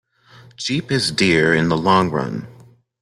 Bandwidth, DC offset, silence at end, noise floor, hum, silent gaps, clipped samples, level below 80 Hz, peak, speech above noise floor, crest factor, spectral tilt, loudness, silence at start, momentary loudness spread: 13 kHz; under 0.1%; 0.5 s; -47 dBFS; none; none; under 0.1%; -50 dBFS; -2 dBFS; 30 dB; 18 dB; -5 dB/octave; -18 LUFS; 0.6 s; 12 LU